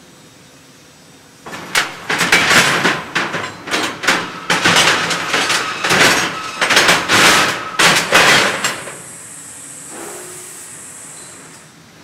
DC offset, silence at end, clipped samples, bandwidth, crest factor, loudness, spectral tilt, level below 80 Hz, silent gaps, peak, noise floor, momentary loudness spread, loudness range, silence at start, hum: under 0.1%; 0.45 s; under 0.1%; 17.5 kHz; 16 dB; -13 LUFS; -1.5 dB/octave; -52 dBFS; none; 0 dBFS; -43 dBFS; 21 LU; 6 LU; 1.45 s; none